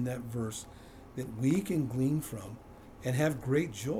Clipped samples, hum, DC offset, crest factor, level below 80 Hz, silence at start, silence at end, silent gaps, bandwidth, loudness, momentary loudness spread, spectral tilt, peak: under 0.1%; none; under 0.1%; 16 dB; -58 dBFS; 0 s; 0 s; none; 19.5 kHz; -33 LUFS; 18 LU; -6.5 dB/octave; -16 dBFS